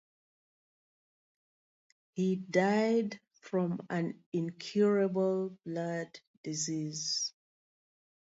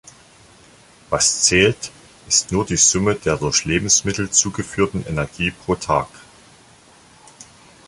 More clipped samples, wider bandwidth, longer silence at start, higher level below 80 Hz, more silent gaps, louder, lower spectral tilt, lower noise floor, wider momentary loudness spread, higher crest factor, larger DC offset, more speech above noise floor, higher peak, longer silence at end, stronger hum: neither; second, 8 kHz vs 11.5 kHz; first, 2.15 s vs 1.1 s; second, -82 dBFS vs -42 dBFS; first, 4.26-4.32 s, 6.27-6.44 s vs none; second, -33 LUFS vs -17 LUFS; first, -5 dB/octave vs -2.5 dB/octave; first, under -90 dBFS vs -49 dBFS; about the same, 12 LU vs 10 LU; about the same, 20 dB vs 20 dB; neither; first, over 58 dB vs 30 dB; second, -14 dBFS vs -2 dBFS; first, 1 s vs 0.45 s; neither